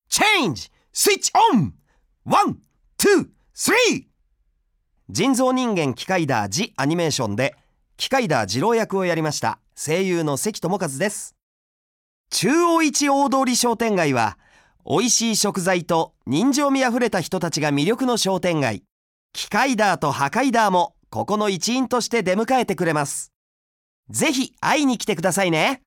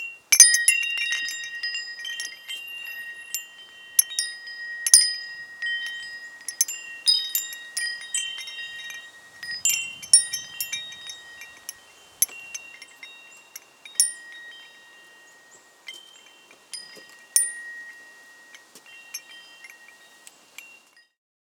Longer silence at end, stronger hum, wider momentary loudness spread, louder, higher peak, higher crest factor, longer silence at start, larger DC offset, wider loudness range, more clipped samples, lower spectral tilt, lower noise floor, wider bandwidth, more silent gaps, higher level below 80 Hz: second, 0.1 s vs 0.75 s; neither; second, 8 LU vs 26 LU; about the same, -20 LUFS vs -22 LUFS; second, -4 dBFS vs 0 dBFS; second, 16 dB vs 28 dB; about the same, 0.1 s vs 0 s; neither; second, 3 LU vs 10 LU; neither; first, -3.5 dB/octave vs 5 dB/octave; first, -67 dBFS vs -54 dBFS; second, 18 kHz vs over 20 kHz; first, 11.42-12.24 s, 18.91-19.29 s, 23.36-24.03 s vs none; first, -60 dBFS vs -82 dBFS